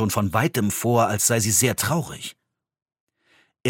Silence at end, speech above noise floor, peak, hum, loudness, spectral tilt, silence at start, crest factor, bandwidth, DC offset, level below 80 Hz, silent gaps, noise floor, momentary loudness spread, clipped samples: 0 s; 41 dB; -4 dBFS; none; -21 LUFS; -4 dB/octave; 0 s; 18 dB; 17 kHz; under 0.1%; -58 dBFS; 3.00-3.07 s; -62 dBFS; 14 LU; under 0.1%